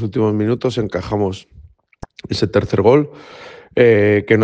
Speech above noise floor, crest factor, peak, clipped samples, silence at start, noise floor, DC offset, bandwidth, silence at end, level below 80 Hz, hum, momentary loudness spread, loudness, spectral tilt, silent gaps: 24 dB; 16 dB; 0 dBFS; under 0.1%; 0 s; -39 dBFS; under 0.1%; 8.8 kHz; 0 s; -46 dBFS; none; 22 LU; -16 LUFS; -7.5 dB/octave; none